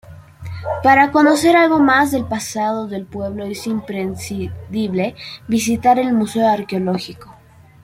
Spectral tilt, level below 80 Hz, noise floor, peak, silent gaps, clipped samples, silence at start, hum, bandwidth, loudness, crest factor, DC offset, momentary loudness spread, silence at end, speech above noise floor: -5 dB/octave; -52 dBFS; -45 dBFS; -2 dBFS; none; under 0.1%; 0.1 s; none; 16 kHz; -17 LUFS; 16 dB; under 0.1%; 14 LU; 0.5 s; 29 dB